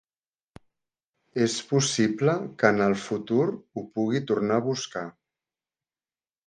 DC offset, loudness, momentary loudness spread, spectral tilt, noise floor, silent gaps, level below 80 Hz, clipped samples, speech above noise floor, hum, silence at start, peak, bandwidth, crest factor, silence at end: under 0.1%; -26 LUFS; 12 LU; -5 dB/octave; under -90 dBFS; none; -68 dBFS; under 0.1%; over 65 dB; none; 1.35 s; -4 dBFS; 10 kHz; 24 dB; 1.4 s